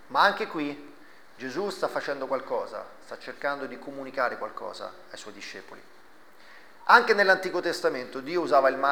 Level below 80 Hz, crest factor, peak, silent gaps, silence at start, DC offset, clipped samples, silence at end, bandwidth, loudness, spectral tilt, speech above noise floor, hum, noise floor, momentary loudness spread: -74 dBFS; 24 dB; -4 dBFS; none; 0.1 s; 0.3%; under 0.1%; 0 s; over 20 kHz; -26 LUFS; -3.5 dB/octave; 28 dB; none; -55 dBFS; 20 LU